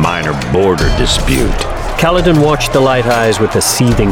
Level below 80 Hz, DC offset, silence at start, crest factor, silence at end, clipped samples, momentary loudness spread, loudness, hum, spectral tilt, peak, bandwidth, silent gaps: -20 dBFS; under 0.1%; 0 s; 10 dB; 0 s; under 0.1%; 5 LU; -12 LUFS; none; -4.5 dB/octave; 0 dBFS; 19 kHz; none